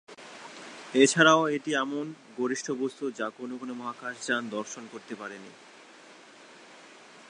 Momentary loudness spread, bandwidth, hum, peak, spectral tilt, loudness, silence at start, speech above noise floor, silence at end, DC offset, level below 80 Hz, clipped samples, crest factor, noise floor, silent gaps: 23 LU; 11 kHz; none; -6 dBFS; -3.5 dB/octave; -27 LUFS; 0.1 s; 24 dB; 0.05 s; under 0.1%; -86 dBFS; under 0.1%; 24 dB; -52 dBFS; none